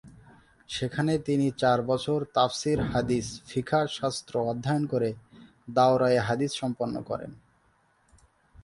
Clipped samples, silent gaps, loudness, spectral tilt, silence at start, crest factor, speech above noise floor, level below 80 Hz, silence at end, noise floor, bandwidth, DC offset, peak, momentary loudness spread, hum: under 0.1%; none; -27 LUFS; -5.5 dB/octave; 0.05 s; 20 dB; 40 dB; -54 dBFS; 1.3 s; -66 dBFS; 11.5 kHz; under 0.1%; -8 dBFS; 10 LU; none